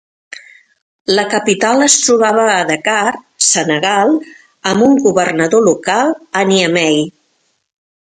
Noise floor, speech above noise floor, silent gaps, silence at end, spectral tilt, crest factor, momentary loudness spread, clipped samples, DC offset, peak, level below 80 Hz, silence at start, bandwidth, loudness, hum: -62 dBFS; 50 dB; 0.82-1.05 s; 1.1 s; -3 dB/octave; 14 dB; 10 LU; under 0.1%; under 0.1%; 0 dBFS; -58 dBFS; 0.35 s; 11.5 kHz; -12 LUFS; none